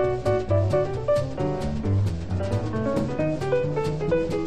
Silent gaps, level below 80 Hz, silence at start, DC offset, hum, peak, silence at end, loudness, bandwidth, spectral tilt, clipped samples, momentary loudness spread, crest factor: none; -38 dBFS; 0 s; 1%; none; -10 dBFS; 0 s; -25 LUFS; 10 kHz; -8 dB/octave; under 0.1%; 4 LU; 14 dB